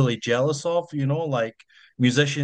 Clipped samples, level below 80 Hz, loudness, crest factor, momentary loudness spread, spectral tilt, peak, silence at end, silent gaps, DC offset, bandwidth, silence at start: under 0.1%; -66 dBFS; -24 LUFS; 18 dB; 6 LU; -5.5 dB/octave; -4 dBFS; 0 s; none; under 0.1%; 9.4 kHz; 0 s